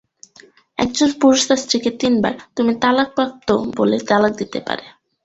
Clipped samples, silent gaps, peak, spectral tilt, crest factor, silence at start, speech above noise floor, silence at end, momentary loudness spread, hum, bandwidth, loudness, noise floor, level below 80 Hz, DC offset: under 0.1%; none; 0 dBFS; -3.5 dB/octave; 18 dB; 0.8 s; 32 dB; 0.35 s; 10 LU; none; 8.2 kHz; -18 LUFS; -49 dBFS; -52 dBFS; under 0.1%